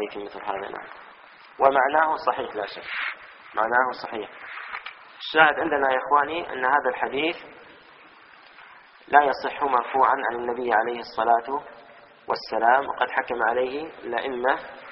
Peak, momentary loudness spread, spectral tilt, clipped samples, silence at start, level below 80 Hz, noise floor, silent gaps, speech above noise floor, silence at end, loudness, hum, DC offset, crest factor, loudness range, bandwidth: -2 dBFS; 16 LU; -0.5 dB/octave; under 0.1%; 0 s; -64 dBFS; -50 dBFS; none; 26 dB; 0 s; -24 LUFS; none; under 0.1%; 24 dB; 3 LU; 5.8 kHz